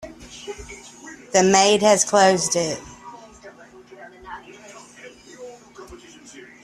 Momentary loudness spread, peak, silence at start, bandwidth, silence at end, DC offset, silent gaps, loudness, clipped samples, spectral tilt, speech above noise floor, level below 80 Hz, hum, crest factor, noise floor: 27 LU; -2 dBFS; 0.05 s; 14 kHz; 0.25 s; under 0.1%; none; -17 LUFS; under 0.1%; -3 dB/octave; 29 dB; -54 dBFS; none; 20 dB; -45 dBFS